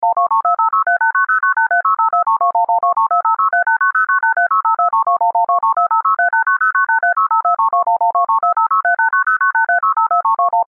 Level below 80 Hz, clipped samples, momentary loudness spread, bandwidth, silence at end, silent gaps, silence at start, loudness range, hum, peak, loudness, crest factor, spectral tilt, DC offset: -82 dBFS; under 0.1%; 1 LU; 2.4 kHz; 0.05 s; none; 0 s; 0 LU; none; -6 dBFS; -14 LUFS; 8 dB; -5.5 dB/octave; under 0.1%